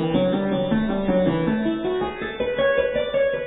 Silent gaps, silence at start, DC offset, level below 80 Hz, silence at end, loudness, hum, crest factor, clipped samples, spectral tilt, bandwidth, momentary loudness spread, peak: none; 0 s; under 0.1%; -42 dBFS; 0 s; -22 LUFS; none; 14 dB; under 0.1%; -10.5 dB/octave; 4 kHz; 5 LU; -8 dBFS